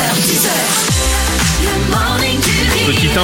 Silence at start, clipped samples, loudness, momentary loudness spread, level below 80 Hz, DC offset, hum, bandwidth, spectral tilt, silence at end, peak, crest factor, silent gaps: 0 s; under 0.1%; -13 LUFS; 2 LU; -22 dBFS; under 0.1%; none; 17 kHz; -3 dB/octave; 0 s; 0 dBFS; 12 dB; none